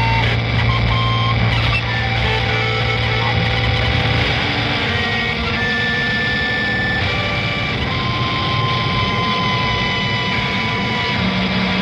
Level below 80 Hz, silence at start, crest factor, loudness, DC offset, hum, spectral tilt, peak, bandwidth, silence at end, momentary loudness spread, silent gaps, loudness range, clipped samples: -30 dBFS; 0 s; 14 dB; -17 LUFS; under 0.1%; none; -5.5 dB/octave; -4 dBFS; 8.2 kHz; 0 s; 2 LU; none; 1 LU; under 0.1%